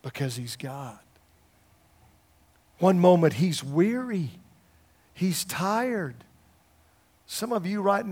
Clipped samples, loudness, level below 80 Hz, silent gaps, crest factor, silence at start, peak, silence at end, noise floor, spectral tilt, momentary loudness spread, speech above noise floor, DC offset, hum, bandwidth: under 0.1%; -26 LUFS; -68 dBFS; none; 22 dB; 0.05 s; -6 dBFS; 0 s; -62 dBFS; -6 dB/octave; 17 LU; 37 dB; under 0.1%; none; 17 kHz